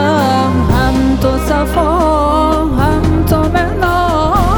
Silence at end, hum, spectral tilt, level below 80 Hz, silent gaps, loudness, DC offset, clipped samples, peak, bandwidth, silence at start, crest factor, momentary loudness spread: 0 s; none; -6.5 dB/octave; -20 dBFS; none; -12 LUFS; under 0.1%; under 0.1%; 0 dBFS; over 20 kHz; 0 s; 12 dB; 2 LU